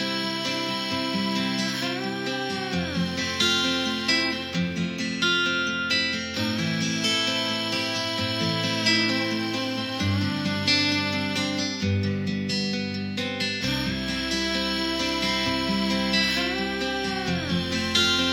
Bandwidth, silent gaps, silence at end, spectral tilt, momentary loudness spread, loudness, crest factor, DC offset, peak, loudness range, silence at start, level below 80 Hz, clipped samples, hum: 16 kHz; none; 0 s; -4 dB/octave; 6 LU; -24 LUFS; 18 dB; under 0.1%; -6 dBFS; 3 LU; 0 s; -50 dBFS; under 0.1%; none